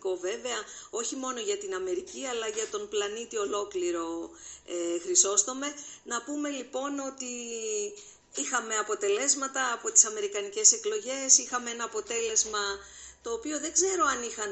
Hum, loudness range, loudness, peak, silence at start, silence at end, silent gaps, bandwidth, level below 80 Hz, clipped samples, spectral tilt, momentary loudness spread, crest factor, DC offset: none; 9 LU; -28 LUFS; -4 dBFS; 0.05 s; 0 s; none; 8.8 kHz; -68 dBFS; under 0.1%; 0.5 dB/octave; 15 LU; 26 dB; under 0.1%